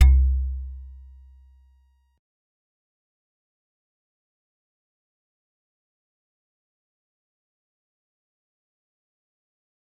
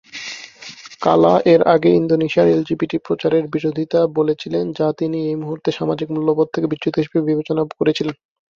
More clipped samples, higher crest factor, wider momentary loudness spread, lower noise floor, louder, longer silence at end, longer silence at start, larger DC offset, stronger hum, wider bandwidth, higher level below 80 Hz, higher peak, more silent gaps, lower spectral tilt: neither; first, 26 dB vs 16 dB; first, 26 LU vs 10 LU; first, -61 dBFS vs -38 dBFS; second, -23 LUFS vs -18 LUFS; first, 9.1 s vs 0.45 s; second, 0 s vs 0.15 s; neither; neither; second, 3.9 kHz vs 7.4 kHz; first, -30 dBFS vs -58 dBFS; about the same, -4 dBFS vs -2 dBFS; neither; about the same, -6 dB/octave vs -7 dB/octave